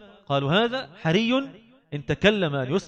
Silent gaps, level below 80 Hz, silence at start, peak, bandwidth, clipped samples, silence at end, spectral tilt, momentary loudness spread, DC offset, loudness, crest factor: none; -52 dBFS; 0 s; -4 dBFS; 8.6 kHz; under 0.1%; 0 s; -6 dB/octave; 13 LU; under 0.1%; -24 LUFS; 20 dB